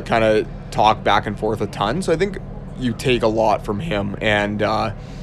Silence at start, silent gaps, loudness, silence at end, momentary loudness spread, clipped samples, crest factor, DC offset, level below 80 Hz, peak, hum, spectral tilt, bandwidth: 0 s; none; -20 LUFS; 0 s; 9 LU; under 0.1%; 18 dB; under 0.1%; -36 dBFS; 0 dBFS; none; -5.5 dB/octave; 13.5 kHz